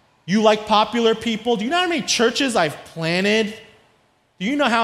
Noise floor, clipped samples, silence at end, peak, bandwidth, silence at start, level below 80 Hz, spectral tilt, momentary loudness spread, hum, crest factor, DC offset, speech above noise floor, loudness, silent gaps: -60 dBFS; under 0.1%; 0 s; -2 dBFS; 14.5 kHz; 0.25 s; -58 dBFS; -3.5 dB/octave; 8 LU; none; 18 dB; under 0.1%; 42 dB; -19 LUFS; none